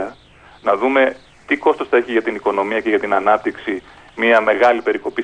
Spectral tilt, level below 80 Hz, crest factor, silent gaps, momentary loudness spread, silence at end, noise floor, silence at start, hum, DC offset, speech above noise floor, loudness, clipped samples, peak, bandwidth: -5 dB/octave; -56 dBFS; 16 dB; none; 11 LU; 0 s; -46 dBFS; 0 s; none; under 0.1%; 29 dB; -17 LUFS; under 0.1%; -2 dBFS; 10 kHz